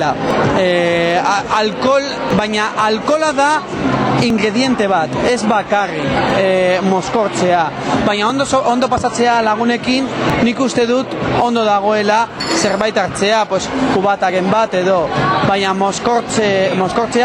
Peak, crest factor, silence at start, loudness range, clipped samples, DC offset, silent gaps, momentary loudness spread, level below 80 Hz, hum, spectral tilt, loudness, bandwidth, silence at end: -2 dBFS; 12 dB; 0 s; 0 LU; under 0.1%; under 0.1%; none; 3 LU; -42 dBFS; none; -4.5 dB/octave; -14 LUFS; 12 kHz; 0 s